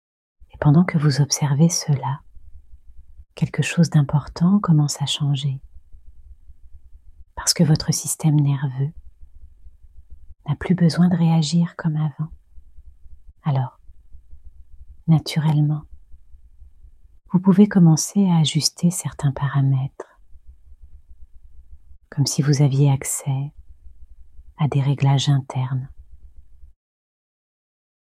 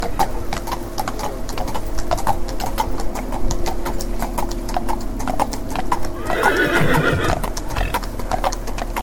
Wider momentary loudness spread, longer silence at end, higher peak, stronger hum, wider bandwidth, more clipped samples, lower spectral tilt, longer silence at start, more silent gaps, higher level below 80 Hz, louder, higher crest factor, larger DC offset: about the same, 12 LU vs 10 LU; first, 1.5 s vs 0 s; about the same, -2 dBFS vs 0 dBFS; neither; second, 14.5 kHz vs 18.5 kHz; neither; about the same, -5.5 dB/octave vs -4.5 dB/octave; first, 0.55 s vs 0 s; neither; second, -48 dBFS vs -26 dBFS; first, -20 LUFS vs -23 LUFS; about the same, 20 dB vs 18 dB; neither